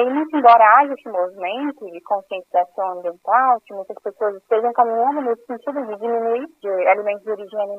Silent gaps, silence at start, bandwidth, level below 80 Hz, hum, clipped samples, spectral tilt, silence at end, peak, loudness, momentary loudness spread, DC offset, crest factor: none; 0 s; 4.9 kHz; -78 dBFS; none; under 0.1%; -6 dB/octave; 0 s; 0 dBFS; -19 LUFS; 14 LU; under 0.1%; 18 dB